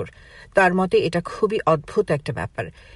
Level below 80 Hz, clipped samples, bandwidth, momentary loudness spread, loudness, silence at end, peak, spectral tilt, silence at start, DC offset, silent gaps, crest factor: -48 dBFS; under 0.1%; 11.5 kHz; 12 LU; -21 LUFS; 0.25 s; -4 dBFS; -6.5 dB/octave; 0 s; under 0.1%; none; 18 dB